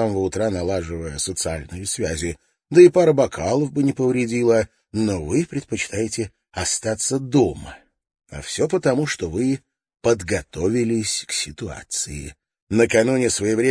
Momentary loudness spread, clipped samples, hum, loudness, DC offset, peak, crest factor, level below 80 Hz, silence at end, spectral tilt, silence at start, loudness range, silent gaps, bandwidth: 12 LU; under 0.1%; none; -21 LUFS; under 0.1%; -2 dBFS; 20 dB; -44 dBFS; 0 s; -4.5 dB/octave; 0 s; 5 LU; 12.62-12.67 s; 10.5 kHz